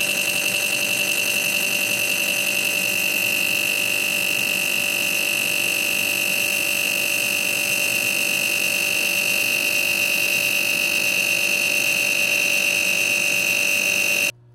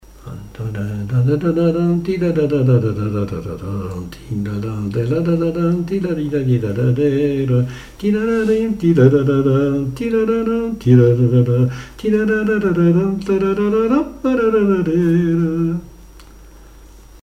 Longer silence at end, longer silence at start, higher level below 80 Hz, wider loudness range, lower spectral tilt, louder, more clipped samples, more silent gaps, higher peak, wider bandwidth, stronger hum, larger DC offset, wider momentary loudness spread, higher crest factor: first, 0.25 s vs 0.05 s; second, 0 s vs 0.2 s; second, -68 dBFS vs -40 dBFS; second, 1 LU vs 5 LU; second, 0 dB/octave vs -9 dB/octave; about the same, -18 LUFS vs -17 LUFS; neither; neither; second, -8 dBFS vs 0 dBFS; first, 17 kHz vs 13 kHz; neither; neither; second, 2 LU vs 11 LU; about the same, 12 dB vs 16 dB